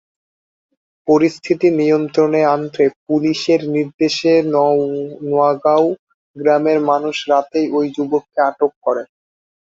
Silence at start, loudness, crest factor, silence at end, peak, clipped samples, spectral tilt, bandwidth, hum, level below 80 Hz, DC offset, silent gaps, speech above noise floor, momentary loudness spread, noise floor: 1.05 s; -16 LUFS; 14 dB; 0.65 s; -2 dBFS; under 0.1%; -6 dB/octave; 7.8 kHz; none; -62 dBFS; under 0.1%; 2.96-3.06 s, 3.94-3.99 s, 5.99-6.07 s, 6.14-6.34 s, 8.76-8.81 s; over 75 dB; 6 LU; under -90 dBFS